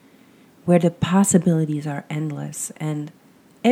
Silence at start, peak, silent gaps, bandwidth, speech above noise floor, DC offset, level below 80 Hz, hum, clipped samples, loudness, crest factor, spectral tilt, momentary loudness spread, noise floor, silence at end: 0.65 s; -2 dBFS; none; 15.5 kHz; 31 dB; under 0.1%; -56 dBFS; none; under 0.1%; -21 LUFS; 20 dB; -6 dB/octave; 13 LU; -51 dBFS; 0 s